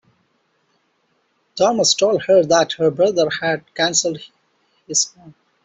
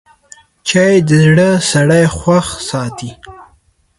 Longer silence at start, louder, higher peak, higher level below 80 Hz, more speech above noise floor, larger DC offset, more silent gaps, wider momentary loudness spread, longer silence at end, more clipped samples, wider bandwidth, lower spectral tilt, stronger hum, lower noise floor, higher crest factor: first, 1.55 s vs 0.65 s; second, -17 LUFS vs -11 LUFS; about the same, -2 dBFS vs 0 dBFS; second, -62 dBFS vs -40 dBFS; first, 48 dB vs 42 dB; neither; neither; second, 9 LU vs 13 LU; second, 0.35 s vs 0.55 s; neither; second, 8.2 kHz vs 11.5 kHz; second, -2.5 dB/octave vs -5.5 dB/octave; neither; first, -65 dBFS vs -53 dBFS; about the same, 16 dB vs 12 dB